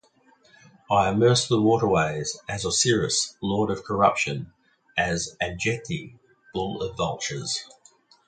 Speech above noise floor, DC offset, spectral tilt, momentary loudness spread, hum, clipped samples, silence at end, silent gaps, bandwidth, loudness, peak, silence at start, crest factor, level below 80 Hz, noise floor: 36 dB; under 0.1%; -4 dB/octave; 11 LU; none; under 0.1%; 0.65 s; none; 9.6 kHz; -24 LUFS; -6 dBFS; 0.9 s; 20 dB; -52 dBFS; -60 dBFS